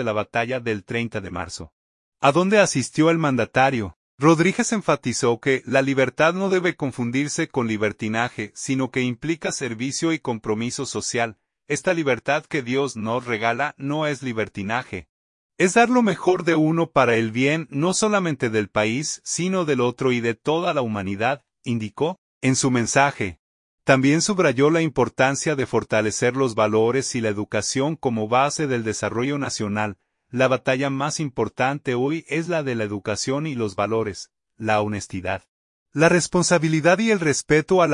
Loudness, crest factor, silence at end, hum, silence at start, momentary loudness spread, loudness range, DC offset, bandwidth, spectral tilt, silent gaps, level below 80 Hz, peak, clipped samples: -22 LUFS; 20 dB; 0 s; none; 0 s; 9 LU; 5 LU; under 0.1%; 11 kHz; -4.5 dB/octave; 1.72-2.12 s, 3.96-4.18 s, 15.09-15.50 s, 22.18-22.41 s, 23.39-23.78 s, 35.48-35.86 s; -58 dBFS; -2 dBFS; under 0.1%